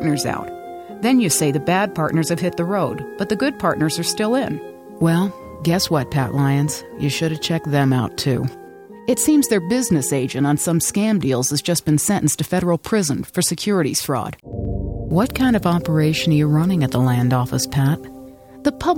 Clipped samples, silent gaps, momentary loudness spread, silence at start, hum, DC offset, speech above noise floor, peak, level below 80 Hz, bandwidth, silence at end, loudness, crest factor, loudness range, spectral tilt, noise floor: under 0.1%; none; 9 LU; 0 s; none; under 0.1%; 21 dB; -4 dBFS; -42 dBFS; 17.5 kHz; 0 s; -19 LUFS; 14 dB; 2 LU; -5 dB/octave; -39 dBFS